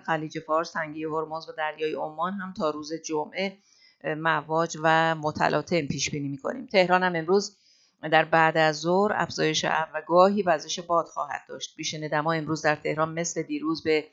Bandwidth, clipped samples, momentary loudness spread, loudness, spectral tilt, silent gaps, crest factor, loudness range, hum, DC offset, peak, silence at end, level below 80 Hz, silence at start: 8 kHz; under 0.1%; 11 LU; -26 LUFS; -4 dB/octave; none; 22 dB; 7 LU; none; under 0.1%; -4 dBFS; 0.05 s; -66 dBFS; 0.05 s